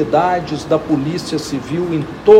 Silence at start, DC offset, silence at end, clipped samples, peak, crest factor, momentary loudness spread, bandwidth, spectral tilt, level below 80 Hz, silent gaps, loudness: 0 s; under 0.1%; 0 s; 0.5%; 0 dBFS; 14 dB; 6 LU; 13.5 kHz; -6.5 dB/octave; -44 dBFS; none; -18 LUFS